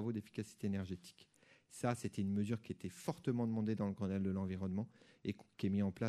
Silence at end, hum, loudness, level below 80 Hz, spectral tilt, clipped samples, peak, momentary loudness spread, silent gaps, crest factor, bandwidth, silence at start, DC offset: 0 s; none; -41 LUFS; -74 dBFS; -7 dB/octave; under 0.1%; -22 dBFS; 10 LU; none; 18 dB; 13.5 kHz; 0 s; under 0.1%